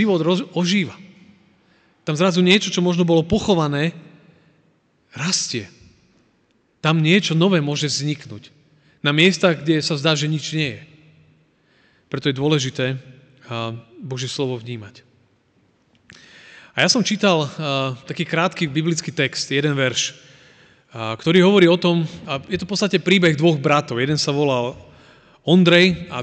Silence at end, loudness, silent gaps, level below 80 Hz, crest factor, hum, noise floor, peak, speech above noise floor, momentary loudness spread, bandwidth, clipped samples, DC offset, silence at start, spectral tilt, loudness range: 0 s; -19 LUFS; none; -54 dBFS; 18 dB; none; -62 dBFS; -2 dBFS; 44 dB; 14 LU; 9 kHz; under 0.1%; under 0.1%; 0 s; -5 dB/octave; 8 LU